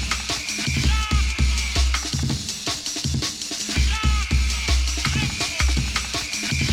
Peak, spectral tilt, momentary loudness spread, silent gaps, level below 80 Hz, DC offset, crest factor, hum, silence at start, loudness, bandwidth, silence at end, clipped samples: -8 dBFS; -3 dB/octave; 4 LU; none; -24 dBFS; under 0.1%; 14 dB; none; 0 s; -22 LUFS; 15.5 kHz; 0 s; under 0.1%